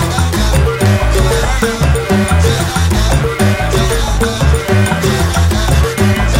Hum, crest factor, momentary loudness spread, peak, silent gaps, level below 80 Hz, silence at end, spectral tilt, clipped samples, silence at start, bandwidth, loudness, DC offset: none; 10 dB; 2 LU; 0 dBFS; none; -16 dBFS; 0 s; -5 dB/octave; under 0.1%; 0 s; 16.5 kHz; -12 LUFS; under 0.1%